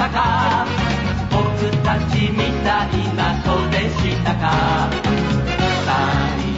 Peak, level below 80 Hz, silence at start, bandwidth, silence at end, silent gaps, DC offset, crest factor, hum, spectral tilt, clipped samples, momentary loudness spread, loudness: -4 dBFS; -30 dBFS; 0 s; 8 kHz; 0 s; none; 0.2%; 14 dB; none; -6 dB/octave; under 0.1%; 2 LU; -18 LUFS